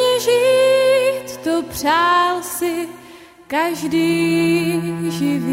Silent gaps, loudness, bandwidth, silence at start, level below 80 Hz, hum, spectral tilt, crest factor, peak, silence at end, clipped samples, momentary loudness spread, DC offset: none; -17 LUFS; 16 kHz; 0 s; -54 dBFS; none; -4.5 dB/octave; 12 dB; -6 dBFS; 0 s; under 0.1%; 9 LU; under 0.1%